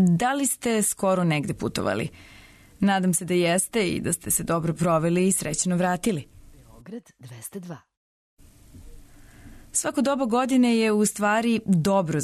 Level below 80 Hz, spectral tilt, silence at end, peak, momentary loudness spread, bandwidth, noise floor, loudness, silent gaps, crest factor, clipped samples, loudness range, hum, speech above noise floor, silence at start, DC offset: -52 dBFS; -4.5 dB/octave; 0 s; -10 dBFS; 16 LU; 13.5 kHz; -48 dBFS; -23 LUFS; 7.97-8.37 s; 14 dB; under 0.1%; 12 LU; none; 25 dB; 0 s; under 0.1%